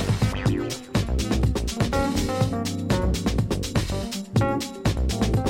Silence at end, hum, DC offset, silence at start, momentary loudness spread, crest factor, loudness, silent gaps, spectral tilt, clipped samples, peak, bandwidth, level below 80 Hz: 0 s; none; under 0.1%; 0 s; 3 LU; 14 dB; -25 LUFS; none; -5.5 dB/octave; under 0.1%; -8 dBFS; 16.5 kHz; -30 dBFS